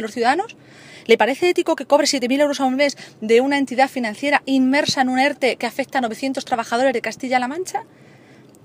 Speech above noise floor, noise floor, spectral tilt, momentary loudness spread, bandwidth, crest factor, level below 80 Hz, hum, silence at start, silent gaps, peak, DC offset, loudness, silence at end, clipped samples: 28 dB; -47 dBFS; -3 dB/octave; 8 LU; 15.5 kHz; 20 dB; -70 dBFS; none; 0 s; none; 0 dBFS; under 0.1%; -19 LUFS; 0.8 s; under 0.1%